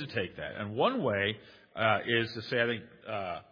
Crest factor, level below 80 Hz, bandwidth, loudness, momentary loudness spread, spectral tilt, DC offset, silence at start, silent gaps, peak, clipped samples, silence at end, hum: 20 dB; -68 dBFS; 5.2 kHz; -31 LUFS; 10 LU; -7 dB/octave; under 0.1%; 0 s; none; -12 dBFS; under 0.1%; 0.1 s; none